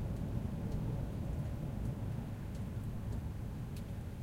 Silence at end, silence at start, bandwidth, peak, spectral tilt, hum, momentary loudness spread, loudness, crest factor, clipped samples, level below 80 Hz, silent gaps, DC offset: 0 s; 0 s; 16 kHz; -24 dBFS; -8 dB/octave; none; 4 LU; -41 LUFS; 16 dB; under 0.1%; -46 dBFS; none; under 0.1%